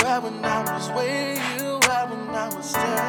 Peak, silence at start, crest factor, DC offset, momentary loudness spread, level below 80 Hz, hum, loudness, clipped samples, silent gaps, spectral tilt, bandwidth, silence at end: -2 dBFS; 0 s; 22 dB; under 0.1%; 8 LU; -60 dBFS; none; -24 LUFS; under 0.1%; none; -3 dB/octave; over 20 kHz; 0 s